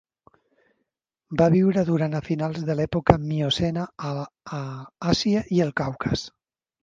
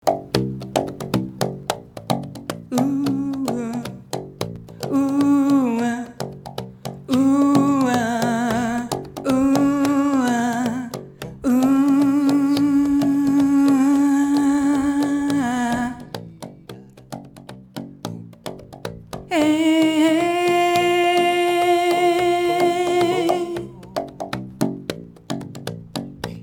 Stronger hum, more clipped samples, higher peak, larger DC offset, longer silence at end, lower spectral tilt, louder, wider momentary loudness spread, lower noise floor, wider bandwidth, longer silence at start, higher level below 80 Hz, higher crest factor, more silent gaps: neither; neither; about the same, 0 dBFS vs 0 dBFS; neither; first, 0.55 s vs 0 s; about the same, -6.5 dB/octave vs -5.5 dB/octave; second, -24 LUFS vs -19 LUFS; second, 13 LU vs 17 LU; first, -79 dBFS vs -41 dBFS; second, 7.6 kHz vs 17.5 kHz; first, 1.3 s vs 0.05 s; first, -46 dBFS vs -52 dBFS; about the same, 24 dB vs 20 dB; neither